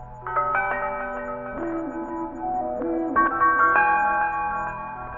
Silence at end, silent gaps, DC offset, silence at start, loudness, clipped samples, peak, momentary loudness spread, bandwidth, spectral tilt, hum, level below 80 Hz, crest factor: 0 s; none; under 0.1%; 0 s; -24 LUFS; under 0.1%; -6 dBFS; 13 LU; 7.4 kHz; -8 dB/octave; none; -48 dBFS; 18 dB